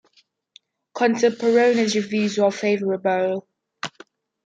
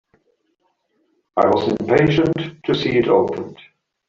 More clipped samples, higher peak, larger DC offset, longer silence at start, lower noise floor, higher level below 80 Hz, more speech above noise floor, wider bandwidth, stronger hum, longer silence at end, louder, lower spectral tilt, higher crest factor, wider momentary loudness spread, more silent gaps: neither; second, -6 dBFS vs -2 dBFS; neither; second, 0.95 s vs 1.35 s; second, -62 dBFS vs -68 dBFS; second, -72 dBFS vs -50 dBFS; second, 42 dB vs 51 dB; first, 9.2 kHz vs 7.4 kHz; neither; about the same, 0.55 s vs 0.55 s; about the same, -20 LUFS vs -18 LUFS; second, -4.5 dB/octave vs -7.5 dB/octave; about the same, 16 dB vs 18 dB; first, 16 LU vs 10 LU; neither